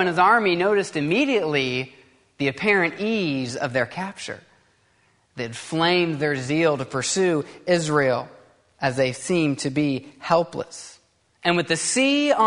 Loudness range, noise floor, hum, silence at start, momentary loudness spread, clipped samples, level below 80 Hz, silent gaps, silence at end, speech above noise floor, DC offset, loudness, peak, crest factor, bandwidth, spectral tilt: 3 LU; -63 dBFS; none; 0 s; 13 LU; under 0.1%; -62 dBFS; none; 0 s; 41 dB; under 0.1%; -22 LUFS; -4 dBFS; 20 dB; 11 kHz; -4 dB/octave